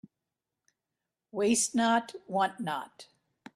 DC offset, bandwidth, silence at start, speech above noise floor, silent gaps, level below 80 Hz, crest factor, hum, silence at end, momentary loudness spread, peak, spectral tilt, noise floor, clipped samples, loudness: under 0.1%; 14.5 kHz; 1.35 s; 58 dB; none; -74 dBFS; 18 dB; none; 0.5 s; 13 LU; -14 dBFS; -3 dB/octave; -88 dBFS; under 0.1%; -29 LUFS